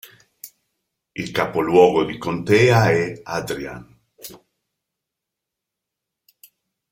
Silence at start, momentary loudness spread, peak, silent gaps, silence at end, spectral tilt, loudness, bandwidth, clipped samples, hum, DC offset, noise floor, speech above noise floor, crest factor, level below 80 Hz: 0.45 s; 26 LU; -2 dBFS; none; 2.55 s; -6 dB/octave; -18 LUFS; 16.5 kHz; under 0.1%; none; under 0.1%; -83 dBFS; 65 dB; 20 dB; -54 dBFS